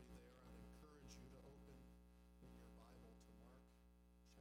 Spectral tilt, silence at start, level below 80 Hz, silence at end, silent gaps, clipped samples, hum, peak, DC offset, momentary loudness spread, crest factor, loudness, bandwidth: -5.5 dB/octave; 0 s; -68 dBFS; 0 s; none; under 0.1%; 60 Hz at -65 dBFS; -50 dBFS; under 0.1%; 5 LU; 16 dB; -65 LUFS; 16 kHz